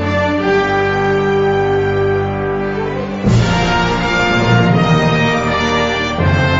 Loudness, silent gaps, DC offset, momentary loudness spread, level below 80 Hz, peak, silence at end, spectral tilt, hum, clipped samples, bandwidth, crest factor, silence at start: -14 LUFS; none; under 0.1%; 6 LU; -30 dBFS; -2 dBFS; 0 s; -6 dB/octave; none; under 0.1%; 7.8 kHz; 12 dB; 0 s